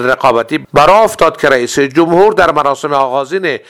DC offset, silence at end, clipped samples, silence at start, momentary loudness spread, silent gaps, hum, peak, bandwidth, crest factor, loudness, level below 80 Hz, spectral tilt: under 0.1%; 0.1 s; 0.8%; 0 s; 6 LU; none; none; 0 dBFS; 16 kHz; 10 dB; -10 LUFS; -40 dBFS; -4.5 dB/octave